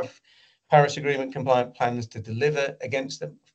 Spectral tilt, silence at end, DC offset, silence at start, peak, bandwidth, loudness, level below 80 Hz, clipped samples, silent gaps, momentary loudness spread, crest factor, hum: -5.5 dB/octave; 0.2 s; under 0.1%; 0 s; -4 dBFS; 8.4 kHz; -25 LUFS; -68 dBFS; under 0.1%; none; 14 LU; 20 dB; none